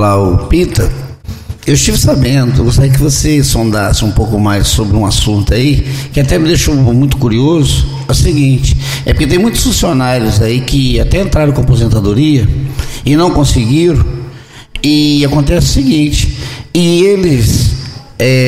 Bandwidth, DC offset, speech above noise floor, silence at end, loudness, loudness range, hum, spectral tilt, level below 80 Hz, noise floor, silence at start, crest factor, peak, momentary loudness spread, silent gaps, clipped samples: 16 kHz; 0.6%; 21 dB; 0 s; -10 LUFS; 1 LU; none; -5.5 dB/octave; -18 dBFS; -30 dBFS; 0 s; 8 dB; 0 dBFS; 7 LU; none; under 0.1%